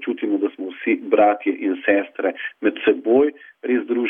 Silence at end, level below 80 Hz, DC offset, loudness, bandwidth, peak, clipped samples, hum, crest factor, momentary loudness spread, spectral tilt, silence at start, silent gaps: 0 s; -68 dBFS; under 0.1%; -20 LUFS; 3.7 kHz; -4 dBFS; under 0.1%; none; 16 dB; 8 LU; -8 dB/octave; 0 s; none